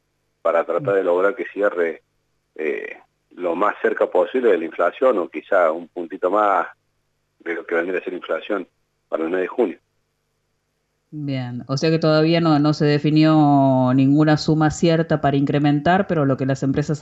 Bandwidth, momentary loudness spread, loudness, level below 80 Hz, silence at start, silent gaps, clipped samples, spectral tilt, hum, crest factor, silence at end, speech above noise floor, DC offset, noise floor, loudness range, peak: 8 kHz; 12 LU; -19 LUFS; -54 dBFS; 0.45 s; none; under 0.1%; -7 dB/octave; 50 Hz at -45 dBFS; 14 dB; 0 s; 52 dB; under 0.1%; -71 dBFS; 9 LU; -6 dBFS